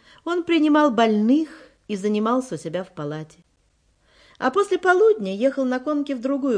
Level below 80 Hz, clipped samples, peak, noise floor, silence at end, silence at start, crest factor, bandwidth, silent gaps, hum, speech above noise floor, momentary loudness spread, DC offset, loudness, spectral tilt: -66 dBFS; under 0.1%; -4 dBFS; -64 dBFS; 0 s; 0.25 s; 16 dB; 10.5 kHz; none; none; 43 dB; 14 LU; under 0.1%; -21 LUFS; -6 dB/octave